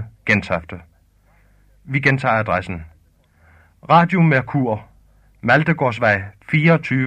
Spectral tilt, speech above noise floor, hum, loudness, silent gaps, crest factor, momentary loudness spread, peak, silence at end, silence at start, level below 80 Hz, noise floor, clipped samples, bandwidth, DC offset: -7.5 dB/octave; 38 dB; 50 Hz at -45 dBFS; -17 LUFS; none; 18 dB; 12 LU; -2 dBFS; 0 s; 0 s; -50 dBFS; -55 dBFS; under 0.1%; 8.8 kHz; under 0.1%